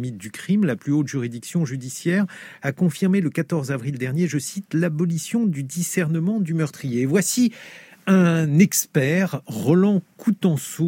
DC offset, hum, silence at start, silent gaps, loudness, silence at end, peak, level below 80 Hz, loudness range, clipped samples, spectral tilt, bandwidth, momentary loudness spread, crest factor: under 0.1%; none; 0 s; none; -22 LUFS; 0 s; -4 dBFS; -70 dBFS; 4 LU; under 0.1%; -6 dB/octave; 17 kHz; 9 LU; 18 dB